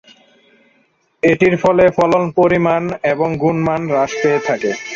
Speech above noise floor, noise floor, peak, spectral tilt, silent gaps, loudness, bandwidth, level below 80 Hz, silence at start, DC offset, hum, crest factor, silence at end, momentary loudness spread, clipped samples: 45 dB; -59 dBFS; 0 dBFS; -6.5 dB/octave; none; -15 LUFS; 7.6 kHz; -48 dBFS; 1.25 s; under 0.1%; none; 14 dB; 0 s; 6 LU; under 0.1%